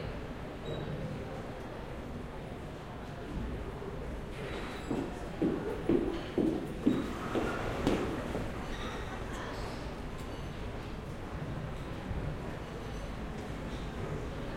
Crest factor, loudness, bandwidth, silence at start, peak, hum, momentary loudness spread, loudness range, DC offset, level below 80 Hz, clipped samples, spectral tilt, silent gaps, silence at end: 24 dB; -38 LUFS; 16.5 kHz; 0 s; -14 dBFS; none; 10 LU; 8 LU; under 0.1%; -46 dBFS; under 0.1%; -6.5 dB/octave; none; 0 s